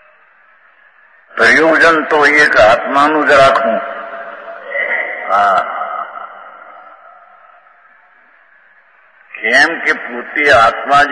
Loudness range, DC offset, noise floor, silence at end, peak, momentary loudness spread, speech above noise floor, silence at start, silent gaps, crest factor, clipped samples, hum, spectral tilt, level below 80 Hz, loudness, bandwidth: 10 LU; under 0.1%; -48 dBFS; 0 s; 0 dBFS; 19 LU; 38 dB; 1.35 s; none; 14 dB; under 0.1%; none; -3.5 dB/octave; -48 dBFS; -10 LUFS; 10.5 kHz